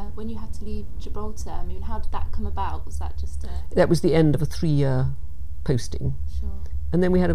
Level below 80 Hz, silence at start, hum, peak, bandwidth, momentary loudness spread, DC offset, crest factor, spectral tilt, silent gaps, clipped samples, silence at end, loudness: -30 dBFS; 0 s; none; -6 dBFS; 13.5 kHz; 15 LU; 6%; 16 dB; -7.5 dB/octave; none; under 0.1%; 0 s; -26 LUFS